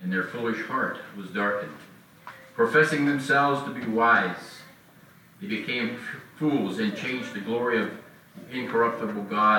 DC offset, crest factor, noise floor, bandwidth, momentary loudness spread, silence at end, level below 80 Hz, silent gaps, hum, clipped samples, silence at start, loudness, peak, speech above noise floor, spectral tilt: under 0.1%; 18 dB; -54 dBFS; 19 kHz; 19 LU; 0 s; -72 dBFS; none; none; under 0.1%; 0 s; -26 LUFS; -8 dBFS; 28 dB; -5.5 dB/octave